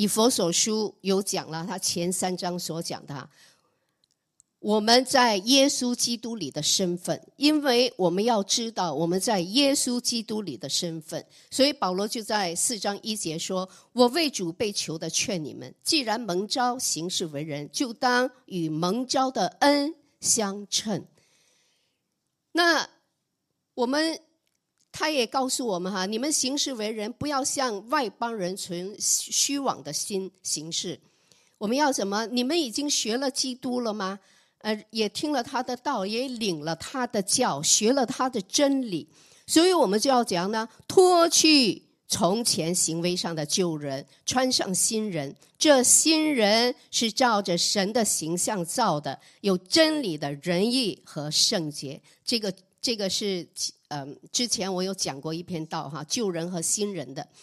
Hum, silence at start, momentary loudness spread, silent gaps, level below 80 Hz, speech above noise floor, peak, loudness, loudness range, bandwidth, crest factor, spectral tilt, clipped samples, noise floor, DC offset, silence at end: none; 0 s; 12 LU; none; -70 dBFS; 54 dB; -4 dBFS; -25 LUFS; 7 LU; 15 kHz; 22 dB; -2.5 dB/octave; under 0.1%; -79 dBFS; under 0.1%; 0.2 s